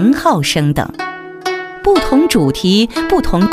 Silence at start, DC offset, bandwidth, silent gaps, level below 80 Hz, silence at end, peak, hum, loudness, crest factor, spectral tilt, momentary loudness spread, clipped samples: 0 s; under 0.1%; 16 kHz; none; -30 dBFS; 0 s; 0 dBFS; none; -14 LUFS; 14 dB; -5.5 dB/octave; 10 LU; under 0.1%